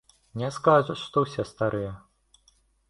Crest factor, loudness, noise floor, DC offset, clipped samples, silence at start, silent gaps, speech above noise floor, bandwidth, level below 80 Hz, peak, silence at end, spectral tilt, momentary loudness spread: 22 dB; -26 LUFS; -65 dBFS; under 0.1%; under 0.1%; 0.35 s; none; 39 dB; 11.5 kHz; -58 dBFS; -6 dBFS; 0.95 s; -6.5 dB/octave; 16 LU